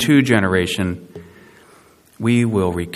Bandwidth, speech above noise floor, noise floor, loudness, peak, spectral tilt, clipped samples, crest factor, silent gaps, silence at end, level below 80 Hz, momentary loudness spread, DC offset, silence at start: 14.5 kHz; 33 dB; -50 dBFS; -18 LUFS; 0 dBFS; -5.5 dB/octave; under 0.1%; 18 dB; none; 0 s; -48 dBFS; 13 LU; under 0.1%; 0 s